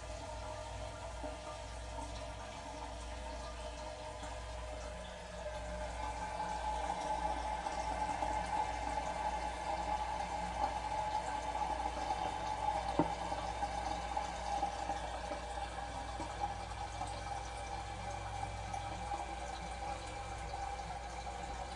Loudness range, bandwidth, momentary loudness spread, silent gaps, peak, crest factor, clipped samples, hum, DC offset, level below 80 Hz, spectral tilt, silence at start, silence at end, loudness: 7 LU; 11.5 kHz; 8 LU; none; -16 dBFS; 24 dB; under 0.1%; none; under 0.1%; -50 dBFS; -4 dB/octave; 0 s; 0 s; -41 LUFS